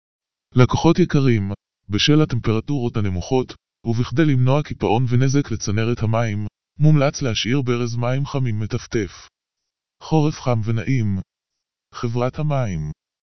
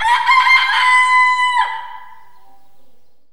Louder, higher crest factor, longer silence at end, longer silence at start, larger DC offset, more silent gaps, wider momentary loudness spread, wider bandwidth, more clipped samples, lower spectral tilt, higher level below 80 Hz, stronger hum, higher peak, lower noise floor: second, -20 LUFS vs -12 LUFS; first, 20 dB vs 14 dB; second, 0.05 s vs 1.3 s; first, 0.2 s vs 0 s; about the same, 2% vs 2%; neither; about the same, 12 LU vs 13 LU; second, 6.4 kHz vs 13 kHz; neither; first, -6 dB/octave vs 3 dB/octave; first, -44 dBFS vs -56 dBFS; neither; about the same, 0 dBFS vs 0 dBFS; first, -83 dBFS vs -53 dBFS